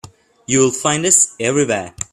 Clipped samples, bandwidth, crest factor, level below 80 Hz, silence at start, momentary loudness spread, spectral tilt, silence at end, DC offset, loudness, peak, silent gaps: under 0.1%; 14.5 kHz; 18 dB; -52 dBFS; 0.5 s; 7 LU; -3 dB/octave; 0.1 s; under 0.1%; -15 LUFS; 0 dBFS; none